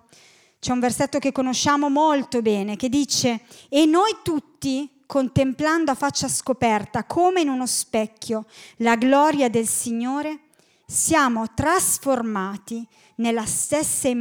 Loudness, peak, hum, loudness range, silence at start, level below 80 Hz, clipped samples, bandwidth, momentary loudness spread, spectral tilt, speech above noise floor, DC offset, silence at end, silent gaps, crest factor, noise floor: -21 LUFS; -4 dBFS; none; 2 LU; 0.65 s; -54 dBFS; under 0.1%; 18.5 kHz; 10 LU; -3.5 dB/octave; 32 dB; under 0.1%; 0 s; none; 18 dB; -53 dBFS